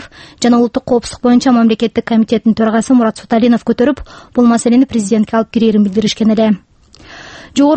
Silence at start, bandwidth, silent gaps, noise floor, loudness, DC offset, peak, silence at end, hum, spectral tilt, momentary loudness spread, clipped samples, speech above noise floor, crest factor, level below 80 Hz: 0 s; 8.8 kHz; none; -38 dBFS; -12 LUFS; under 0.1%; 0 dBFS; 0 s; none; -5.5 dB/octave; 6 LU; under 0.1%; 27 dB; 12 dB; -44 dBFS